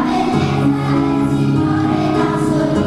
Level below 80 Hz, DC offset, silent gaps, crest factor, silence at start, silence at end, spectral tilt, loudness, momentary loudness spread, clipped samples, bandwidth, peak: -38 dBFS; under 0.1%; none; 12 dB; 0 s; 0 s; -7.5 dB/octave; -16 LUFS; 1 LU; under 0.1%; 12 kHz; -4 dBFS